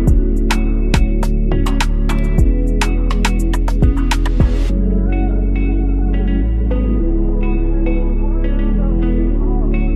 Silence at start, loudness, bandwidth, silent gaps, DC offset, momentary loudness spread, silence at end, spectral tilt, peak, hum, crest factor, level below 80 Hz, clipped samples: 0 s; -17 LUFS; 10.5 kHz; none; under 0.1%; 3 LU; 0 s; -6.5 dB/octave; 0 dBFS; none; 12 dB; -14 dBFS; under 0.1%